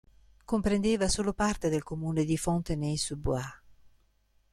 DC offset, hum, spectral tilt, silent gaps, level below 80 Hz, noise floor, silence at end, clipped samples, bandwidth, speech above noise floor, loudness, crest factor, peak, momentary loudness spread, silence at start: under 0.1%; none; -5 dB/octave; none; -46 dBFS; -68 dBFS; 0.95 s; under 0.1%; 13.5 kHz; 39 dB; -30 LUFS; 16 dB; -16 dBFS; 6 LU; 0.5 s